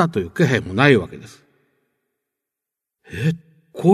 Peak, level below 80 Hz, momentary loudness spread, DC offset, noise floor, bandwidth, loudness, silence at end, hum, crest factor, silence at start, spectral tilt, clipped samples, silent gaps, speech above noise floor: 0 dBFS; -54 dBFS; 21 LU; under 0.1%; -85 dBFS; 13.5 kHz; -18 LUFS; 0 s; none; 20 dB; 0 s; -7 dB/octave; under 0.1%; none; 67 dB